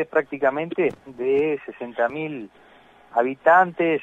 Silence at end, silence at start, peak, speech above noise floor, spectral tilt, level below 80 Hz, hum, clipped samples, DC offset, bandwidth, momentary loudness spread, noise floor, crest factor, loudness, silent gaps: 0 s; 0 s; -2 dBFS; 30 dB; -7.5 dB/octave; -66 dBFS; none; under 0.1%; under 0.1%; 7.8 kHz; 15 LU; -52 dBFS; 20 dB; -22 LUFS; none